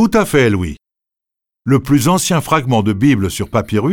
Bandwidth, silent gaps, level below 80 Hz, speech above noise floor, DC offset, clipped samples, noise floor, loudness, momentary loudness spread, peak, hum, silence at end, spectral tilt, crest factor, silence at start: 19 kHz; none; -38 dBFS; 71 dB; under 0.1%; under 0.1%; -84 dBFS; -14 LUFS; 7 LU; -2 dBFS; none; 0 s; -5.5 dB/octave; 12 dB; 0 s